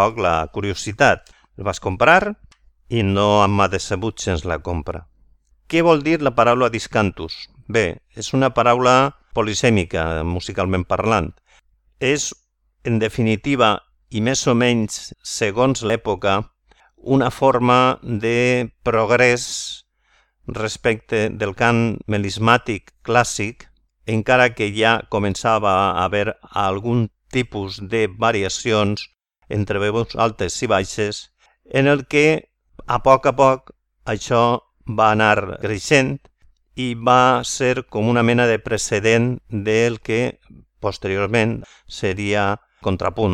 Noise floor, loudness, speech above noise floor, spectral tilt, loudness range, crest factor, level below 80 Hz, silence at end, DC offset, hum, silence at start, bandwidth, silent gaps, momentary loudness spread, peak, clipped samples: -61 dBFS; -19 LUFS; 43 dB; -5 dB/octave; 4 LU; 20 dB; -44 dBFS; 0 s; under 0.1%; none; 0 s; 13 kHz; none; 12 LU; 0 dBFS; under 0.1%